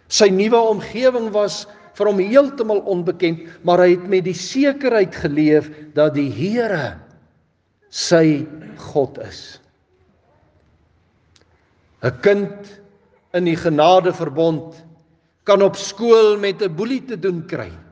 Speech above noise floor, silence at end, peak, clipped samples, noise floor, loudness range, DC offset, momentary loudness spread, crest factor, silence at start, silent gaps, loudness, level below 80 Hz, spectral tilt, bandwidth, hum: 45 dB; 0.15 s; 0 dBFS; under 0.1%; -62 dBFS; 8 LU; under 0.1%; 14 LU; 18 dB; 0.1 s; none; -17 LUFS; -58 dBFS; -5 dB/octave; 9.8 kHz; none